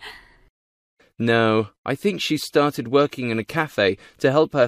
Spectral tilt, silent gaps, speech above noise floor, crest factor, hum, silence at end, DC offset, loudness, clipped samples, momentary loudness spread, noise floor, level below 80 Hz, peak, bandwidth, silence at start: -5.5 dB/octave; 0.50-0.97 s, 1.78-1.84 s; 22 dB; 18 dB; none; 0 s; under 0.1%; -21 LUFS; under 0.1%; 7 LU; -43 dBFS; -62 dBFS; -4 dBFS; 15.5 kHz; 0 s